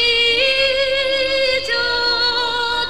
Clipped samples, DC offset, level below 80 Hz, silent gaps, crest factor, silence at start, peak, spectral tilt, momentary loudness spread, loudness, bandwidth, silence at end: under 0.1%; 1%; -44 dBFS; none; 12 dB; 0 s; -6 dBFS; -1.5 dB/octave; 4 LU; -15 LUFS; 13.5 kHz; 0 s